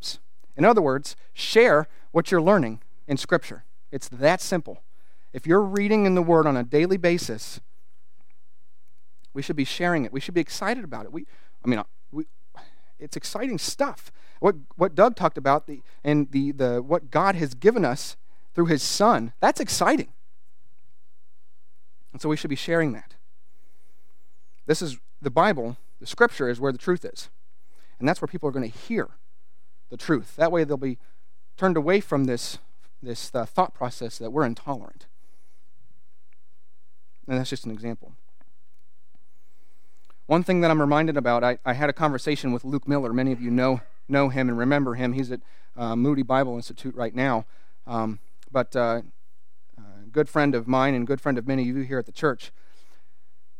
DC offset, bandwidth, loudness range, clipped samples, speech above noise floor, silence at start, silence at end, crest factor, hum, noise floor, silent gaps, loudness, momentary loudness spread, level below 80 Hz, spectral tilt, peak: 2%; 16.5 kHz; 8 LU; under 0.1%; 51 dB; 0.05 s; 1.1 s; 22 dB; none; -75 dBFS; none; -24 LUFS; 16 LU; -68 dBFS; -5.5 dB/octave; -2 dBFS